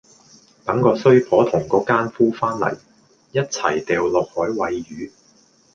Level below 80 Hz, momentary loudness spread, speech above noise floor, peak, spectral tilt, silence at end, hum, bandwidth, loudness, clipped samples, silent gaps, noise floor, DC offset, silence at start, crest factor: -56 dBFS; 15 LU; 37 dB; -2 dBFS; -6 dB/octave; 0.65 s; none; 7.6 kHz; -19 LUFS; under 0.1%; none; -55 dBFS; under 0.1%; 0.65 s; 18 dB